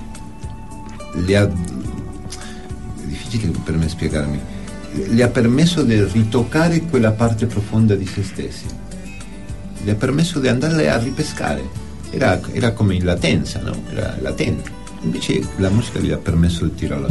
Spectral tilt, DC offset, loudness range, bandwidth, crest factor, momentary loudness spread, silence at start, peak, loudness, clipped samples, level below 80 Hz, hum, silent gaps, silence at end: -6.5 dB/octave; 2%; 6 LU; 11.5 kHz; 16 dB; 16 LU; 0 s; -2 dBFS; -19 LUFS; under 0.1%; -34 dBFS; none; none; 0 s